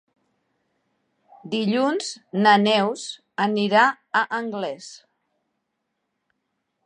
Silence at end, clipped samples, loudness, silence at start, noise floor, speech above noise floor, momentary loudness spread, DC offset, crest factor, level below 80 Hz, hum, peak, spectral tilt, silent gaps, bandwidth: 1.9 s; under 0.1%; -21 LUFS; 1.45 s; -77 dBFS; 56 dB; 15 LU; under 0.1%; 20 dB; -78 dBFS; none; -4 dBFS; -4.5 dB/octave; none; 10 kHz